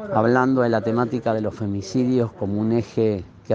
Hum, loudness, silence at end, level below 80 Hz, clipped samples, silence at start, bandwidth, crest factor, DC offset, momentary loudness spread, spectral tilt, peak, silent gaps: none; -22 LUFS; 0 s; -58 dBFS; under 0.1%; 0 s; 7.6 kHz; 18 dB; under 0.1%; 7 LU; -7.5 dB/octave; -4 dBFS; none